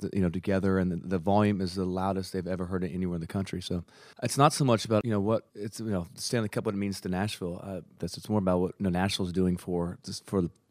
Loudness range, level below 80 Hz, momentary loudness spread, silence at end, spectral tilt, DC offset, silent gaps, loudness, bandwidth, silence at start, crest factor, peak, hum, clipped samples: 3 LU; -62 dBFS; 11 LU; 0.2 s; -6 dB/octave; under 0.1%; none; -30 LUFS; 15.5 kHz; 0 s; 22 dB; -6 dBFS; none; under 0.1%